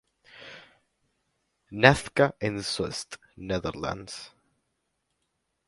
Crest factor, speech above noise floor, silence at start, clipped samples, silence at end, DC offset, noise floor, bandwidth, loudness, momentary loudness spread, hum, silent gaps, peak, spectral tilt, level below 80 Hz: 28 dB; 52 dB; 0.35 s; under 0.1%; 1.4 s; under 0.1%; -78 dBFS; 11.5 kHz; -26 LUFS; 25 LU; none; none; -2 dBFS; -4.5 dB/octave; -54 dBFS